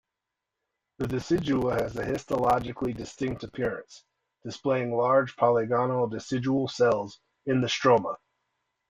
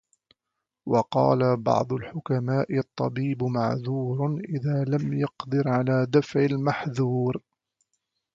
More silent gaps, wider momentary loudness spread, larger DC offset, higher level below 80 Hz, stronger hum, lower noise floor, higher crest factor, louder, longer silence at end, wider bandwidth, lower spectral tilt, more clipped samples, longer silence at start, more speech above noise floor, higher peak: neither; first, 12 LU vs 7 LU; neither; first, -56 dBFS vs -62 dBFS; neither; about the same, -86 dBFS vs -84 dBFS; about the same, 20 dB vs 18 dB; about the same, -27 LUFS vs -25 LUFS; second, 0.75 s vs 0.95 s; first, 15 kHz vs 7.4 kHz; second, -6 dB/octave vs -8.5 dB/octave; neither; first, 1 s vs 0.85 s; about the same, 60 dB vs 60 dB; about the same, -8 dBFS vs -6 dBFS